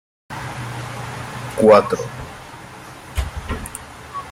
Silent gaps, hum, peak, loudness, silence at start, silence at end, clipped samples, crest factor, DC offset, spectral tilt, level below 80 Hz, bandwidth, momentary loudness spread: none; none; -2 dBFS; -20 LUFS; 0.3 s; 0 s; under 0.1%; 20 dB; under 0.1%; -5.5 dB/octave; -36 dBFS; 16 kHz; 24 LU